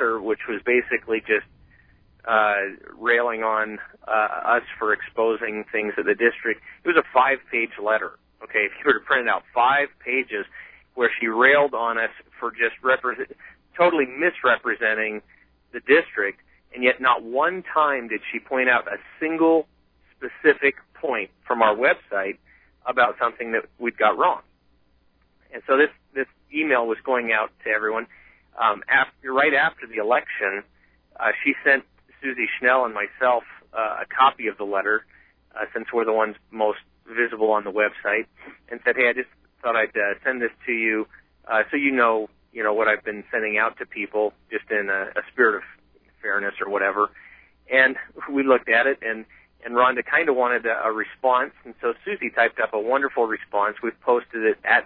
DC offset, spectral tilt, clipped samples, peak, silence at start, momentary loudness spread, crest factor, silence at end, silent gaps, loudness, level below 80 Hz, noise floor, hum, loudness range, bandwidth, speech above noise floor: under 0.1%; -7.5 dB/octave; under 0.1%; -2 dBFS; 0 s; 11 LU; 20 dB; 0 s; none; -22 LUFS; -64 dBFS; -62 dBFS; none; 3 LU; 4.3 kHz; 40 dB